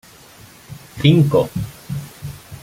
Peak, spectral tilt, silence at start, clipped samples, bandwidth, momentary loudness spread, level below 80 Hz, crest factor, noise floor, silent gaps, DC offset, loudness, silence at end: -2 dBFS; -7 dB/octave; 0.7 s; under 0.1%; 16 kHz; 24 LU; -46 dBFS; 18 dB; -44 dBFS; none; under 0.1%; -18 LUFS; 0.05 s